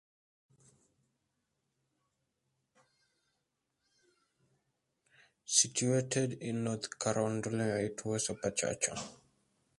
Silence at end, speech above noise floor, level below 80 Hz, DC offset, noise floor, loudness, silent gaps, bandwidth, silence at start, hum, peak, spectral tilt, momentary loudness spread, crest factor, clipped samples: 0.65 s; 50 dB; -70 dBFS; under 0.1%; -84 dBFS; -33 LUFS; none; 11.5 kHz; 5.5 s; none; -12 dBFS; -3.5 dB/octave; 9 LU; 26 dB; under 0.1%